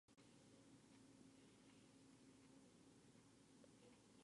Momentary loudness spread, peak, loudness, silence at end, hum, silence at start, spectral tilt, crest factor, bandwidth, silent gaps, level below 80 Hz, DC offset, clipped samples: 1 LU; -54 dBFS; -69 LUFS; 0 s; none; 0.1 s; -4.5 dB/octave; 16 dB; 11 kHz; none; under -90 dBFS; under 0.1%; under 0.1%